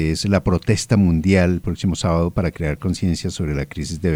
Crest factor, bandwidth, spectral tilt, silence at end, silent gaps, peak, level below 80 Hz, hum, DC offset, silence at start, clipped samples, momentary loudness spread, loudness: 14 dB; 15 kHz; -6 dB/octave; 0 s; none; -4 dBFS; -34 dBFS; none; under 0.1%; 0 s; under 0.1%; 8 LU; -20 LUFS